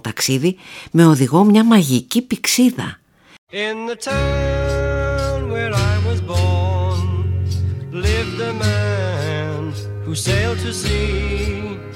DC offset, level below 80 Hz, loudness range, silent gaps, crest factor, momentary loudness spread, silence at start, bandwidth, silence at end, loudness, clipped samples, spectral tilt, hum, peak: under 0.1%; -30 dBFS; 6 LU; 3.38-3.47 s; 18 dB; 12 LU; 0.05 s; 17.5 kHz; 0 s; -18 LUFS; under 0.1%; -5.5 dB/octave; none; 0 dBFS